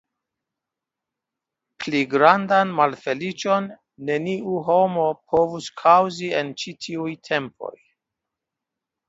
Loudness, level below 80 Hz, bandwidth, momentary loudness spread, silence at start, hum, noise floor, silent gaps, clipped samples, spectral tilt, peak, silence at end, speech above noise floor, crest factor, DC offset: -21 LUFS; -64 dBFS; 8 kHz; 15 LU; 1.8 s; none; -86 dBFS; none; under 0.1%; -5 dB/octave; 0 dBFS; 1.4 s; 65 dB; 22 dB; under 0.1%